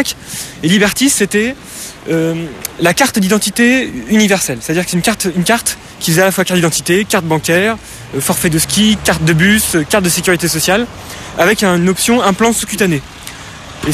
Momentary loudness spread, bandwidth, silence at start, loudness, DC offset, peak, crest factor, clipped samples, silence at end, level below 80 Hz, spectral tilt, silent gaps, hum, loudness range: 13 LU; 14.5 kHz; 0 s; -12 LUFS; under 0.1%; 0 dBFS; 14 dB; under 0.1%; 0 s; -38 dBFS; -3.5 dB/octave; none; none; 2 LU